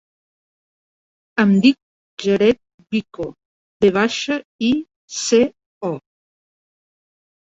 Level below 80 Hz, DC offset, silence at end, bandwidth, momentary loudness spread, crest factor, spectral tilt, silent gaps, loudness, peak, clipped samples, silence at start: -56 dBFS; under 0.1%; 1.6 s; 8 kHz; 15 LU; 20 dB; -5 dB/octave; 1.82-2.17 s, 2.74-2.78 s, 3.45-3.80 s, 4.45-4.59 s, 4.96-5.08 s, 5.66-5.81 s; -19 LUFS; -2 dBFS; under 0.1%; 1.35 s